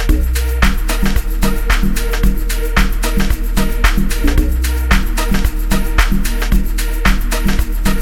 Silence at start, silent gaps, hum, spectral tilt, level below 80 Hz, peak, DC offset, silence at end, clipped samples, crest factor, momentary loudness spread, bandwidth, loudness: 0 s; none; none; -4.5 dB/octave; -14 dBFS; 0 dBFS; under 0.1%; 0 s; under 0.1%; 12 dB; 3 LU; 17 kHz; -17 LUFS